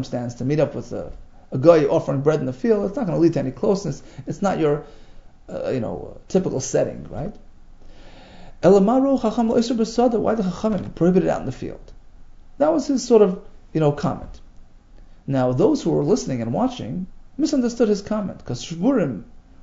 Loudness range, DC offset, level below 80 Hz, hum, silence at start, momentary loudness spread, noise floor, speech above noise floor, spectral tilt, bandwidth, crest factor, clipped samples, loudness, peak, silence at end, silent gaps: 5 LU; under 0.1%; -44 dBFS; none; 0 s; 16 LU; -44 dBFS; 24 dB; -7 dB/octave; 8 kHz; 20 dB; under 0.1%; -21 LUFS; 0 dBFS; 0.2 s; none